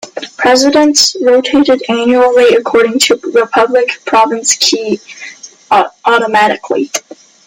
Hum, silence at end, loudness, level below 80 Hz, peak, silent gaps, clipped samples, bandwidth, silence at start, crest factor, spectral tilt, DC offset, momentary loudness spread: none; 0.5 s; -10 LUFS; -54 dBFS; 0 dBFS; none; under 0.1%; 16.5 kHz; 0.05 s; 10 dB; -2 dB/octave; under 0.1%; 11 LU